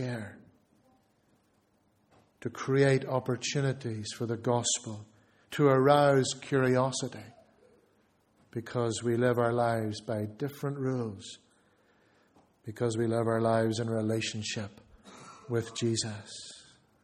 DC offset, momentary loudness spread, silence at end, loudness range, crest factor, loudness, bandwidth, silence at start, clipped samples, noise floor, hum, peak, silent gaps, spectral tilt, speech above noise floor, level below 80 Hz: under 0.1%; 19 LU; 0.45 s; 6 LU; 22 dB; -30 LUFS; 14.5 kHz; 0 s; under 0.1%; -70 dBFS; none; -8 dBFS; none; -5 dB/octave; 41 dB; -68 dBFS